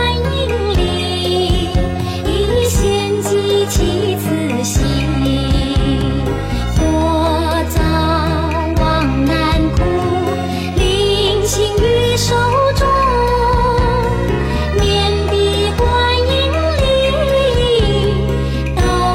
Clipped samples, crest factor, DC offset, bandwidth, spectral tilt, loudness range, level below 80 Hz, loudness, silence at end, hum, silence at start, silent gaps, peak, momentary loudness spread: under 0.1%; 10 dB; under 0.1%; 16.5 kHz; -5.5 dB/octave; 2 LU; -20 dBFS; -15 LUFS; 0 s; none; 0 s; none; -4 dBFS; 4 LU